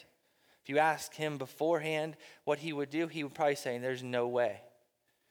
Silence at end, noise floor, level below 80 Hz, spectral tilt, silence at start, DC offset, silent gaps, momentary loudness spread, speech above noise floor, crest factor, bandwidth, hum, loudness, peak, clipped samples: 0.6 s; -76 dBFS; -84 dBFS; -5 dB/octave; 0.65 s; under 0.1%; none; 7 LU; 42 dB; 20 dB; over 20 kHz; none; -34 LUFS; -16 dBFS; under 0.1%